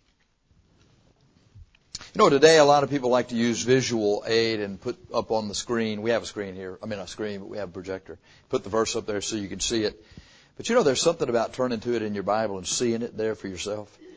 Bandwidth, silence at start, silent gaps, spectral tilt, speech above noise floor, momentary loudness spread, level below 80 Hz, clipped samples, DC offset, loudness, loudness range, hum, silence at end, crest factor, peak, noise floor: 8 kHz; 1.55 s; none; -4 dB/octave; 42 dB; 15 LU; -56 dBFS; under 0.1%; under 0.1%; -25 LUFS; 9 LU; none; 0 s; 22 dB; -4 dBFS; -67 dBFS